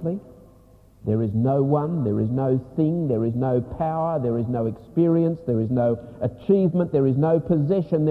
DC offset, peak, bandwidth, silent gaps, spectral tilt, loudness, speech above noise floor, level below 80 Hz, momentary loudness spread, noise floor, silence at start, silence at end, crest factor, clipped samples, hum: under 0.1%; -8 dBFS; 4.5 kHz; none; -11.5 dB/octave; -23 LUFS; 30 dB; -50 dBFS; 6 LU; -52 dBFS; 0 s; 0 s; 14 dB; under 0.1%; none